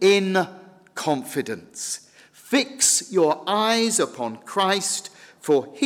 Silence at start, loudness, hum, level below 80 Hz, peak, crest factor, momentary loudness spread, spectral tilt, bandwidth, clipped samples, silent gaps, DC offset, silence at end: 0 s; -22 LUFS; none; -74 dBFS; -8 dBFS; 16 dB; 14 LU; -2.5 dB/octave; 16 kHz; under 0.1%; none; under 0.1%; 0 s